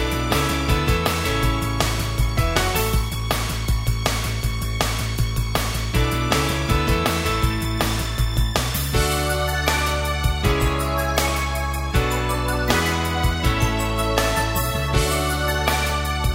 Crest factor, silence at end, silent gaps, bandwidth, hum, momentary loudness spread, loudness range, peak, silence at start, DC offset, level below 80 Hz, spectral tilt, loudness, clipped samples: 18 dB; 0 s; none; 16.5 kHz; none; 3 LU; 1 LU; -2 dBFS; 0 s; under 0.1%; -26 dBFS; -4.5 dB/octave; -21 LUFS; under 0.1%